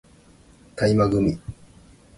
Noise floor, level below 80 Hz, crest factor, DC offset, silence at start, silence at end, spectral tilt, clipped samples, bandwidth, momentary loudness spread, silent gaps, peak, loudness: -52 dBFS; -44 dBFS; 18 dB; under 0.1%; 0.75 s; 0.65 s; -7.5 dB/octave; under 0.1%; 11.5 kHz; 22 LU; none; -6 dBFS; -21 LUFS